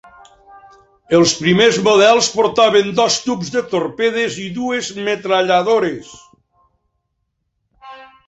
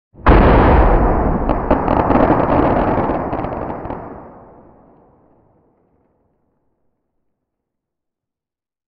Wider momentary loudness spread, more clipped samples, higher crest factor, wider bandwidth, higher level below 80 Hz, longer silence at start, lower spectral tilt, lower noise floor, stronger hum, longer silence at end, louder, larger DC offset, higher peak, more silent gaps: second, 10 LU vs 16 LU; neither; about the same, 16 dB vs 16 dB; first, 8.2 kHz vs 5.2 kHz; second, -56 dBFS vs -22 dBFS; first, 0.55 s vs 0.2 s; second, -3.5 dB/octave vs -10.5 dB/octave; second, -71 dBFS vs -88 dBFS; neither; second, 0.25 s vs 4.55 s; about the same, -15 LUFS vs -15 LUFS; neither; about the same, 0 dBFS vs 0 dBFS; neither